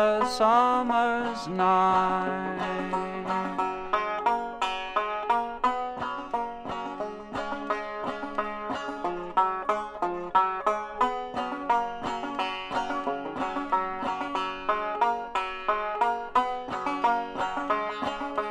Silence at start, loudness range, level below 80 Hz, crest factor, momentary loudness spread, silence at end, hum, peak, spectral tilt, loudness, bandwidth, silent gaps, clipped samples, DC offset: 0 s; 4 LU; -54 dBFS; 18 dB; 9 LU; 0 s; none; -10 dBFS; -5 dB/octave; -28 LUFS; 11.5 kHz; none; under 0.1%; under 0.1%